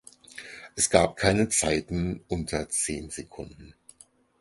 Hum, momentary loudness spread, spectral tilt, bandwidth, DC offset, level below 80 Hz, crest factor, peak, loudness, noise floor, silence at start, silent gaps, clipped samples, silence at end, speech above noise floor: none; 20 LU; -3.5 dB/octave; 12 kHz; under 0.1%; -46 dBFS; 26 dB; -4 dBFS; -26 LUFS; -58 dBFS; 0.35 s; none; under 0.1%; 0.7 s; 31 dB